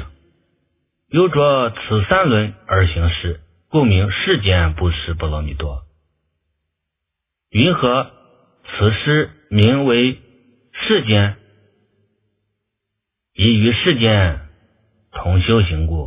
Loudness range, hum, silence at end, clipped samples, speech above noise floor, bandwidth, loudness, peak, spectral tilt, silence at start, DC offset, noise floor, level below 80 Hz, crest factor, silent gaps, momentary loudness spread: 5 LU; none; 0 s; under 0.1%; 64 dB; 3.9 kHz; -16 LUFS; 0 dBFS; -10.5 dB/octave; 0 s; under 0.1%; -80 dBFS; -28 dBFS; 18 dB; none; 13 LU